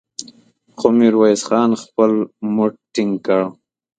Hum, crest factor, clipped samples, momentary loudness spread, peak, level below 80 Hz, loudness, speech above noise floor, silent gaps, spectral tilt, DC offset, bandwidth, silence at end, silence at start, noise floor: none; 16 dB; under 0.1%; 9 LU; 0 dBFS; -64 dBFS; -17 LUFS; 33 dB; none; -5.5 dB/octave; under 0.1%; 9.4 kHz; 0.45 s; 0.2 s; -48 dBFS